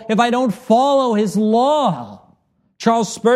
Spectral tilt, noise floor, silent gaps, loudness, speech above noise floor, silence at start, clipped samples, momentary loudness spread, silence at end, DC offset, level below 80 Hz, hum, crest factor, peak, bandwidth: -5.5 dB/octave; -59 dBFS; none; -16 LUFS; 43 dB; 0 s; under 0.1%; 7 LU; 0 s; under 0.1%; -62 dBFS; none; 14 dB; -2 dBFS; 13.5 kHz